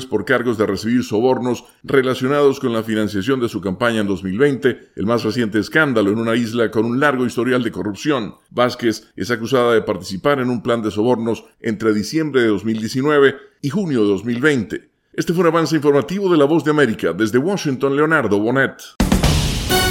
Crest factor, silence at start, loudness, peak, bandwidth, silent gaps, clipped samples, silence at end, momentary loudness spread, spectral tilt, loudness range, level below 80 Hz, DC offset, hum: 18 dB; 0 s; -18 LUFS; 0 dBFS; 17 kHz; none; under 0.1%; 0 s; 7 LU; -5.5 dB/octave; 2 LU; -36 dBFS; under 0.1%; none